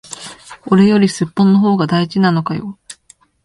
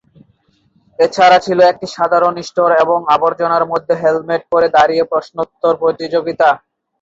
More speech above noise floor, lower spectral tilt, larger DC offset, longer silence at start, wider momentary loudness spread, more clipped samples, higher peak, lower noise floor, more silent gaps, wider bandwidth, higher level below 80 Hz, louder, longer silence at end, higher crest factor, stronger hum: second, 37 dB vs 44 dB; first, -6.5 dB/octave vs -5 dB/octave; neither; second, 0.1 s vs 1 s; first, 19 LU vs 8 LU; neither; about the same, 0 dBFS vs 0 dBFS; second, -50 dBFS vs -57 dBFS; neither; first, 11.5 kHz vs 7.8 kHz; about the same, -54 dBFS vs -56 dBFS; about the same, -14 LUFS vs -13 LUFS; about the same, 0.5 s vs 0.45 s; about the same, 14 dB vs 14 dB; neither